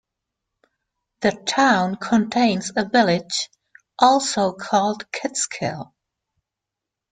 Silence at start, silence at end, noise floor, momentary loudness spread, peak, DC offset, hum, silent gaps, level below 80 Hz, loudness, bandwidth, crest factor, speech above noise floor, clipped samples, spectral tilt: 1.2 s; 1.25 s; -85 dBFS; 10 LU; -2 dBFS; under 0.1%; none; none; -62 dBFS; -20 LUFS; 9.6 kHz; 20 dB; 65 dB; under 0.1%; -3.5 dB/octave